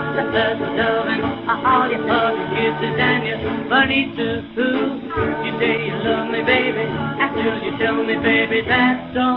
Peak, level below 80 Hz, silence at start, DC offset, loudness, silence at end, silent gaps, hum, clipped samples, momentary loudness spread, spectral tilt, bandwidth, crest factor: -2 dBFS; -46 dBFS; 0 s; under 0.1%; -19 LUFS; 0 s; none; none; under 0.1%; 6 LU; -3 dB/octave; 5.4 kHz; 18 dB